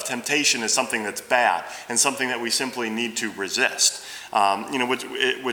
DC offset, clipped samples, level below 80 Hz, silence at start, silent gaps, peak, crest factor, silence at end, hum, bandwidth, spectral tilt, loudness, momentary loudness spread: under 0.1%; under 0.1%; -70 dBFS; 0 s; none; -4 dBFS; 20 dB; 0 s; none; over 20 kHz; -0.5 dB/octave; -22 LUFS; 7 LU